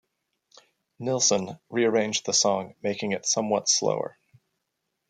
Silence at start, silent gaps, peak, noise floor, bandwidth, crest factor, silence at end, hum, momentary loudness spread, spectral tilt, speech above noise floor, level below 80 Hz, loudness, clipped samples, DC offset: 1 s; none; -8 dBFS; -80 dBFS; 11 kHz; 18 dB; 1 s; none; 9 LU; -2.5 dB/octave; 55 dB; -74 dBFS; -25 LUFS; under 0.1%; under 0.1%